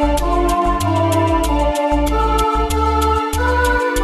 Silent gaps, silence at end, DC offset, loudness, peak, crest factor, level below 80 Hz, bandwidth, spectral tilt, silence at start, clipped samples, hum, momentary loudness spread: none; 0 s; under 0.1%; -16 LUFS; -2 dBFS; 14 dB; -22 dBFS; 13 kHz; -5.5 dB/octave; 0 s; under 0.1%; none; 2 LU